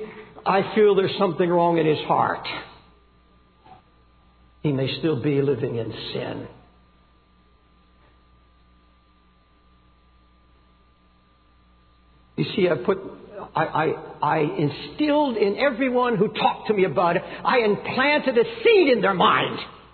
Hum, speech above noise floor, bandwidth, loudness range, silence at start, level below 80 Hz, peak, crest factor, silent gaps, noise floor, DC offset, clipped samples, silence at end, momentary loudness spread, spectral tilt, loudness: none; 37 dB; 4.6 kHz; 10 LU; 0 s; -58 dBFS; -6 dBFS; 18 dB; none; -58 dBFS; under 0.1%; under 0.1%; 0.15 s; 12 LU; -9.5 dB/octave; -22 LUFS